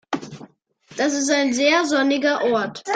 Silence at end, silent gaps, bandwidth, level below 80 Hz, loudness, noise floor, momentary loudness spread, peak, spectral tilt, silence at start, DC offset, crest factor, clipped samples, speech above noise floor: 0 s; none; 9.4 kHz; -68 dBFS; -20 LUFS; -51 dBFS; 13 LU; -4 dBFS; -2.5 dB/octave; 0.1 s; under 0.1%; 16 dB; under 0.1%; 32 dB